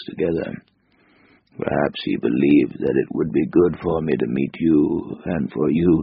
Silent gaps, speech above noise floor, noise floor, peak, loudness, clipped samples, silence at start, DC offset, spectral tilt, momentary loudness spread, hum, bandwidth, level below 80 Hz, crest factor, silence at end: none; 39 dB; -58 dBFS; -4 dBFS; -20 LUFS; under 0.1%; 0 s; under 0.1%; -7 dB/octave; 9 LU; none; 5.2 kHz; -48 dBFS; 16 dB; 0 s